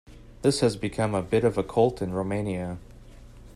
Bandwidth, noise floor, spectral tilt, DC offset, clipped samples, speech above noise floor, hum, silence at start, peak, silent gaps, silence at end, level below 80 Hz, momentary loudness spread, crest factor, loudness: 14 kHz; -47 dBFS; -6 dB/octave; under 0.1%; under 0.1%; 21 dB; none; 0.1 s; -8 dBFS; none; 0.05 s; -48 dBFS; 8 LU; 18 dB; -26 LUFS